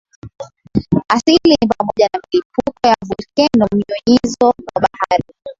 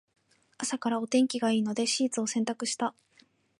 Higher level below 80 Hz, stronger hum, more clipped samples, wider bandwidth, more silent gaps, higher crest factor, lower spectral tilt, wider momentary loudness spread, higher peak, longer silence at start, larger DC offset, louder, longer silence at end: first, -44 dBFS vs -82 dBFS; neither; neither; second, 7.8 kHz vs 11.5 kHz; first, 2.45-2.50 s vs none; about the same, 16 dB vs 16 dB; first, -5.5 dB/octave vs -3 dB/octave; first, 10 LU vs 7 LU; first, 0 dBFS vs -14 dBFS; second, 0.25 s vs 0.6 s; neither; first, -15 LUFS vs -29 LUFS; second, 0.05 s vs 0.7 s